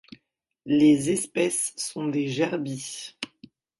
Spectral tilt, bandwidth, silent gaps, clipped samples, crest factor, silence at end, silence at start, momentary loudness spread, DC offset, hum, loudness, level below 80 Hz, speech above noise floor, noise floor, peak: -4.5 dB/octave; 11.5 kHz; none; under 0.1%; 18 dB; 0.55 s; 0.65 s; 16 LU; under 0.1%; none; -25 LUFS; -66 dBFS; 49 dB; -73 dBFS; -8 dBFS